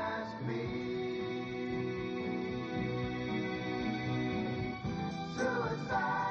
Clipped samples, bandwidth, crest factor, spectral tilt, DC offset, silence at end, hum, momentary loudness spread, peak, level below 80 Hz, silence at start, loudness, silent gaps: under 0.1%; 7.6 kHz; 16 dB; -5 dB/octave; under 0.1%; 0 s; none; 4 LU; -20 dBFS; -58 dBFS; 0 s; -36 LUFS; none